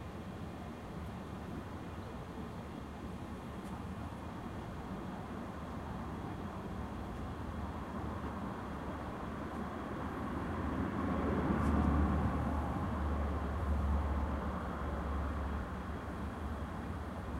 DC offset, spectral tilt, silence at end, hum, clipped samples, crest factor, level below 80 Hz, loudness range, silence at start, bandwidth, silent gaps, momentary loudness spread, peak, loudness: under 0.1%; -8 dB/octave; 0 s; none; under 0.1%; 20 dB; -44 dBFS; 10 LU; 0 s; 13 kHz; none; 11 LU; -20 dBFS; -40 LUFS